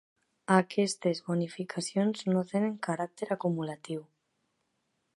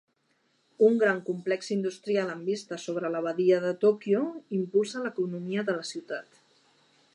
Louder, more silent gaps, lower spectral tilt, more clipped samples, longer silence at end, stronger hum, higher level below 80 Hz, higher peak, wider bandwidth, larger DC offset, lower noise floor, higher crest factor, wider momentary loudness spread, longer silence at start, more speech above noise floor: second, -31 LUFS vs -28 LUFS; neither; about the same, -5.5 dB/octave vs -5.5 dB/octave; neither; first, 1.15 s vs 0.95 s; neither; first, -78 dBFS vs -84 dBFS; about the same, -8 dBFS vs -10 dBFS; about the same, 11.5 kHz vs 11 kHz; neither; first, -79 dBFS vs -71 dBFS; first, 24 dB vs 18 dB; about the same, 11 LU vs 10 LU; second, 0.5 s vs 0.8 s; first, 48 dB vs 44 dB